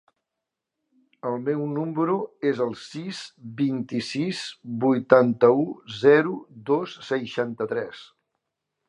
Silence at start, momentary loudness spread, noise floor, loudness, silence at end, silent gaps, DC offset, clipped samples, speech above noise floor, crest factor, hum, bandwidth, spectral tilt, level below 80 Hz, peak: 1.25 s; 16 LU; -85 dBFS; -24 LUFS; 0.85 s; none; under 0.1%; under 0.1%; 61 dB; 24 dB; none; 11 kHz; -6.5 dB/octave; -72 dBFS; 0 dBFS